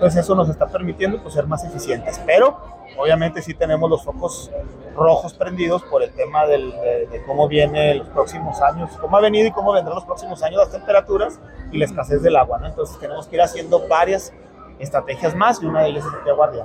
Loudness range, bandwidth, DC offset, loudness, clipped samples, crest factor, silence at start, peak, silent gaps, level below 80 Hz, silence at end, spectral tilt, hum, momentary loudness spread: 2 LU; 15.5 kHz; under 0.1%; -19 LUFS; under 0.1%; 16 dB; 0 s; -4 dBFS; none; -40 dBFS; 0 s; -6 dB/octave; none; 11 LU